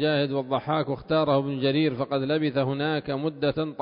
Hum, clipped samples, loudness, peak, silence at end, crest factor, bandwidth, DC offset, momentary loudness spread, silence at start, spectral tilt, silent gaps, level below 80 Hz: none; under 0.1%; -26 LUFS; -10 dBFS; 0 s; 16 dB; 5.4 kHz; under 0.1%; 4 LU; 0 s; -11 dB/octave; none; -60 dBFS